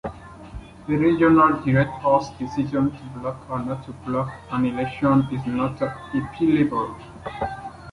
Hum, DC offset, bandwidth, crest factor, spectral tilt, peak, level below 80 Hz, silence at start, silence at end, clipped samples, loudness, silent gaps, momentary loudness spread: none; under 0.1%; 11 kHz; 18 dB; -8.5 dB/octave; -4 dBFS; -48 dBFS; 0.05 s; 0 s; under 0.1%; -22 LUFS; none; 18 LU